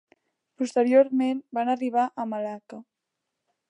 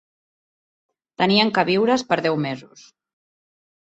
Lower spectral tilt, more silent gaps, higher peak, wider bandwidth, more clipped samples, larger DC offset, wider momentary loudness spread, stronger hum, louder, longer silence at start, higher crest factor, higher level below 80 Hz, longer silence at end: about the same, -5.5 dB/octave vs -5 dB/octave; neither; second, -8 dBFS vs -2 dBFS; first, 10 kHz vs 8.2 kHz; neither; neither; first, 18 LU vs 10 LU; neither; second, -25 LUFS vs -19 LUFS; second, 0.6 s vs 1.2 s; about the same, 18 dB vs 20 dB; second, -84 dBFS vs -64 dBFS; second, 0.85 s vs 1.25 s